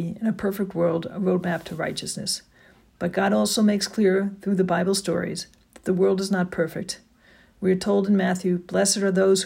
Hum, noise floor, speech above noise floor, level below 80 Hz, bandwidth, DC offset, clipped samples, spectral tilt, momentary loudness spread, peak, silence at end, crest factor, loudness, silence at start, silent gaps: none; -55 dBFS; 33 dB; -60 dBFS; 16.5 kHz; under 0.1%; under 0.1%; -5 dB/octave; 9 LU; -10 dBFS; 0 s; 14 dB; -24 LUFS; 0 s; none